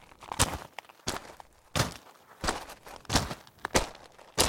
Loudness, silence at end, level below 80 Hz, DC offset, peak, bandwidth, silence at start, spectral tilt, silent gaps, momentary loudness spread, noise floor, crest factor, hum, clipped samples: -32 LUFS; 0 s; -46 dBFS; under 0.1%; -4 dBFS; 17 kHz; 0.2 s; -3 dB/octave; none; 17 LU; -52 dBFS; 30 dB; none; under 0.1%